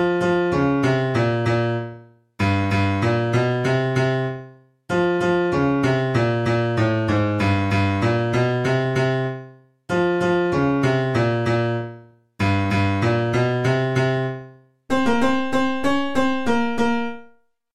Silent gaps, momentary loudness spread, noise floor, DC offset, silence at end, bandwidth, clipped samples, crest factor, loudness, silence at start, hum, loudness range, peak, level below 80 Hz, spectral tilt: none; 6 LU; -54 dBFS; under 0.1%; 0 s; 11.5 kHz; under 0.1%; 14 dB; -21 LUFS; 0 s; none; 2 LU; -6 dBFS; -50 dBFS; -7 dB/octave